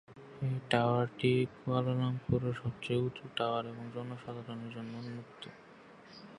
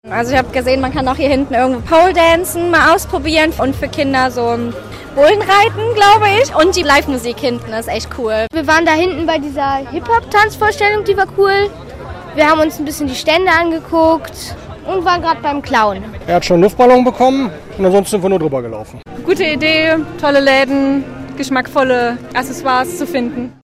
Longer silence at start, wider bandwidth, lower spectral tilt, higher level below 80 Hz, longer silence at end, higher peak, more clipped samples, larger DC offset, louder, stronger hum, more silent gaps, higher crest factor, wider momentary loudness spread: about the same, 0.1 s vs 0.05 s; second, 11.5 kHz vs 16 kHz; first, -7.5 dB/octave vs -4.5 dB/octave; second, -62 dBFS vs -36 dBFS; second, 0 s vs 0.15 s; second, -12 dBFS vs 0 dBFS; neither; neither; second, -35 LUFS vs -13 LUFS; neither; neither; first, 24 dB vs 12 dB; first, 19 LU vs 11 LU